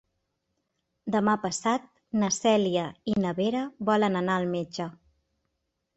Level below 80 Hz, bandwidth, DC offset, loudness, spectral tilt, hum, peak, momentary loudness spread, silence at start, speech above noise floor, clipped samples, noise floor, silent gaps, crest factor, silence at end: -66 dBFS; 8.4 kHz; under 0.1%; -27 LUFS; -5 dB/octave; none; -10 dBFS; 9 LU; 1.05 s; 54 dB; under 0.1%; -80 dBFS; none; 18 dB; 1.05 s